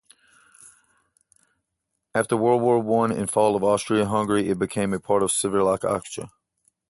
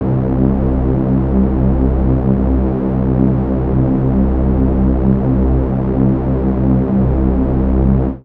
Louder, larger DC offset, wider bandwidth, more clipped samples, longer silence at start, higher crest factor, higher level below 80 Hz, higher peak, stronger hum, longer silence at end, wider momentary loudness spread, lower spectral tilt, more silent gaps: second, -22 LUFS vs -15 LUFS; neither; first, 12 kHz vs 3.1 kHz; neither; first, 2.15 s vs 0 s; about the same, 18 dB vs 14 dB; second, -56 dBFS vs -18 dBFS; second, -6 dBFS vs 0 dBFS; neither; first, 0.6 s vs 0.05 s; first, 8 LU vs 2 LU; second, -5 dB/octave vs -13 dB/octave; neither